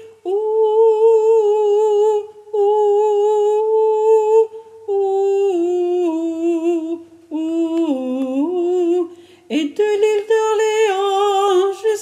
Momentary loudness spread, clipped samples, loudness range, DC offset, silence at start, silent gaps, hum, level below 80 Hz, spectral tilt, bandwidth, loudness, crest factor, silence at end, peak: 9 LU; under 0.1%; 5 LU; under 0.1%; 0 s; none; none; -78 dBFS; -3.5 dB/octave; 10 kHz; -17 LUFS; 12 dB; 0 s; -4 dBFS